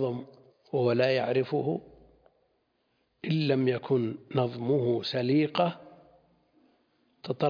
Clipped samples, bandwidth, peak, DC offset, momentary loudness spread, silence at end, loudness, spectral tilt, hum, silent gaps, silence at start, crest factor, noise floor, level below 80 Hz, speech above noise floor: under 0.1%; 5.2 kHz; -12 dBFS; under 0.1%; 12 LU; 0 s; -28 LUFS; -8.5 dB/octave; none; none; 0 s; 18 dB; -74 dBFS; -72 dBFS; 46 dB